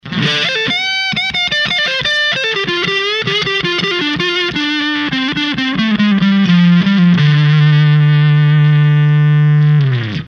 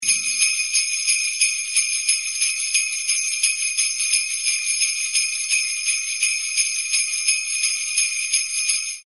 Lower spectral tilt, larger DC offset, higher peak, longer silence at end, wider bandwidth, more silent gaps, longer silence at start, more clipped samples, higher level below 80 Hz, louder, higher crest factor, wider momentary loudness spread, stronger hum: first, -6 dB/octave vs 6.5 dB/octave; second, under 0.1% vs 0.1%; about the same, 0 dBFS vs -2 dBFS; about the same, 0 s vs 0.05 s; second, 6.8 kHz vs 12 kHz; neither; about the same, 0.05 s vs 0 s; neither; first, -48 dBFS vs -78 dBFS; first, -12 LUFS vs -19 LUFS; second, 12 dB vs 20 dB; first, 5 LU vs 2 LU; neither